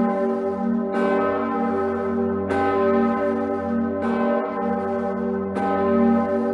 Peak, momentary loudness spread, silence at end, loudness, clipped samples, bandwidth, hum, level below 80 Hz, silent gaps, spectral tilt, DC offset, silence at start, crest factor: -8 dBFS; 5 LU; 0 s; -22 LUFS; under 0.1%; 6 kHz; none; -60 dBFS; none; -8.5 dB/octave; under 0.1%; 0 s; 14 dB